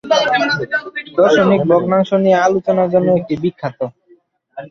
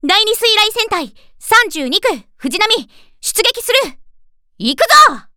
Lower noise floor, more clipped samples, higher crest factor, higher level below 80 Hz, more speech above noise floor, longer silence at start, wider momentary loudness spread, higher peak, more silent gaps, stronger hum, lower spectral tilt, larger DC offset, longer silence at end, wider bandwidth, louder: first, -52 dBFS vs -47 dBFS; neither; about the same, 14 dB vs 14 dB; second, -54 dBFS vs -48 dBFS; first, 38 dB vs 33 dB; about the same, 0.05 s vs 0.05 s; second, 11 LU vs 14 LU; about the same, -2 dBFS vs 0 dBFS; neither; neither; first, -6 dB/octave vs -0.5 dB/octave; neither; second, 0 s vs 0.15 s; second, 7.2 kHz vs over 20 kHz; second, -15 LUFS vs -12 LUFS